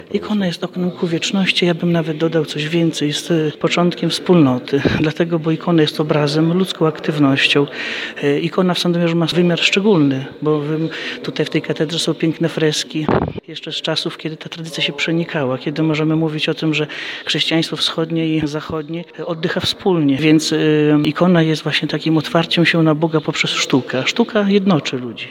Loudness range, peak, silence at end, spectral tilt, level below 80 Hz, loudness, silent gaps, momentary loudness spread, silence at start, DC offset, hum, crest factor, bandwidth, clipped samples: 4 LU; 0 dBFS; 0 s; -5.5 dB/octave; -50 dBFS; -17 LUFS; none; 9 LU; 0 s; under 0.1%; none; 16 dB; 16 kHz; under 0.1%